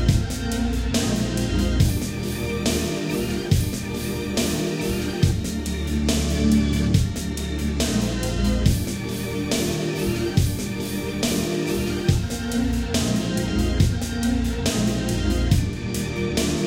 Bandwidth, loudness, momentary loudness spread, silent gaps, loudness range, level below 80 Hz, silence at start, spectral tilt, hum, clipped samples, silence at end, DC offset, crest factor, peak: 17 kHz; -23 LUFS; 6 LU; none; 2 LU; -30 dBFS; 0 s; -5 dB/octave; none; under 0.1%; 0 s; under 0.1%; 18 dB; -4 dBFS